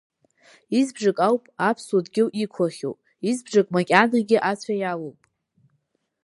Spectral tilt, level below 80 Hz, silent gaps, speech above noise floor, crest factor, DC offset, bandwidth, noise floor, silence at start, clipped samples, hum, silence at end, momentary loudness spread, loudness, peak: -5.5 dB/octave; -74 dBFS; none; 50 dB; 24 dB; under 0.1%; 11.5 kHz; -72 dBFS; 0.7 s; under 0.1%; none; 1.15 s; 11 LU; -23 LUFS; 0 dBFS